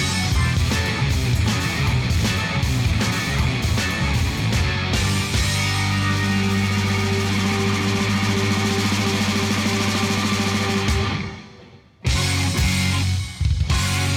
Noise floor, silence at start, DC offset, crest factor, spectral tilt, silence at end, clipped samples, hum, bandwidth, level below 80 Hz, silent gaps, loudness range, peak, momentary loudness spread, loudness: -46 dBFS; 0 s; under 0.1%; 10 dB; -4.5 dB/octave; 0 s; under 0.1%; none; 17.5 kHz; -30 dBFS; none; 2 LU; -10 dBFS; 2 LU; -20 LUFS